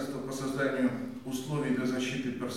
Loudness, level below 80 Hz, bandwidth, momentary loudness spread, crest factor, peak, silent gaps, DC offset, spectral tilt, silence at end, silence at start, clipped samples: -32 LUFS; -66 dBFS; 15.5 kHz; 8 LU; 16 dB; -16 dBFS; none; 0.1%; -5.5 dB/octave; 0 s; 0 s; under 0.1%